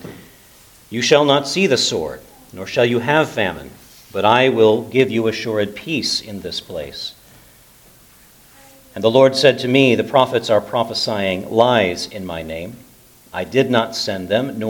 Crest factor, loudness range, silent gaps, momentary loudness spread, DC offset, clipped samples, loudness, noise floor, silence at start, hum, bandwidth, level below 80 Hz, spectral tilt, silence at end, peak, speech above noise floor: 18 dB; 7 LU; none; 16 LU; under 0.1%; under 0.1%; -17 LUFS; -48 dBFS; 0 s; none; 19 kHz; -54 dBFS; -4.5 dB/octave; 0 s; 0 dBFS; 31 dB